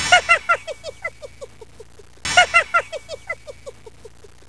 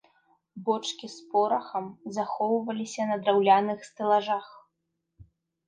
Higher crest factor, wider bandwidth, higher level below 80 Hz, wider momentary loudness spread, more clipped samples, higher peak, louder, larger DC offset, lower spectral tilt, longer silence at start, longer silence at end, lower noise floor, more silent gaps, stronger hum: about the same, 22 dB vs 20 dB; first, 11 kHz vs 9.8 kHz; first, -50 dBFS vs -72 dBFS; first, 25 LU vs 13 LU; neither; first, 0 dBFS vs -8 dBFS; first, -17 LUFS vs -27 LUFS; first, 0.6% vs under 0.1%; second, -0.5 dB/octave vs -4.5 dB/octave; second, 0 s vs 0.55 s; first, 0.8 s vs 0.45 s; second, -41 dBFS vs -81 dBFS; neither; neither